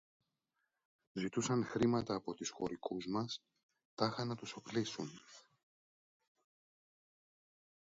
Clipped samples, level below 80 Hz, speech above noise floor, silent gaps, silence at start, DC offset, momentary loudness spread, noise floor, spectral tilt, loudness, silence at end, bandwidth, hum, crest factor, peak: under 0.1%; -74 dBFS; 48 dB; 3.63-3.69 s, 3.85-3.97 s; 1.15 s; under 0.1%; 14 LU; -87 dBFS; -5 dB/octave; -40 LUFS; 2.45 s; 7.6 kHz; none; 26 dB; -16 dBFS